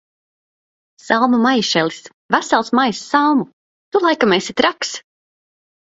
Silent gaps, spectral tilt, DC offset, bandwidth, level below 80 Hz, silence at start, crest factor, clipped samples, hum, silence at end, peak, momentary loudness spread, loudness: 2.14-2.29 s, 3.53-3.92 s; -3.5 dB/octave; under 0.1%; 8 kHz; -60 dBFS; 1.05 s; 18 dB; under 0.1%; none; 0.95 s; 0 dBFS; 11 LU; -16 LUFS